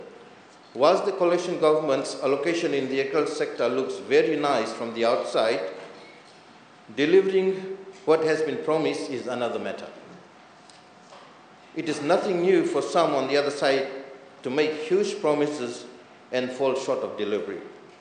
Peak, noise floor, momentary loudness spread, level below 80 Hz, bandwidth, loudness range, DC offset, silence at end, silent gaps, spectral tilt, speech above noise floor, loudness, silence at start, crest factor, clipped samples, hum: -6 dBFS; -51 dBFS; 16 LU; -80 dBFS; 9.6 kHz; 4 LU; under 0.1%; 0.15 s; none; -5 dB/octave; 27 dB; -25 LUFS; 0 s; 20 dB; under 0.1%; none